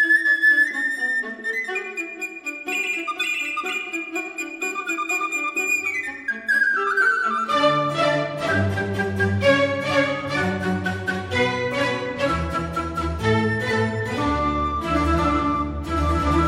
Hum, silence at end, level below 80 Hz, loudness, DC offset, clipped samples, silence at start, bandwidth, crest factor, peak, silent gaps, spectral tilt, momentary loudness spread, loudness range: none; 0 s; -36 dBFS; -22 LUFS; under 0.1%; under 0.1%; 0 s; 15.5 kHz; 16 dB; -6 dBFS; none; -5 dB/octave; 8 LU; 4 LU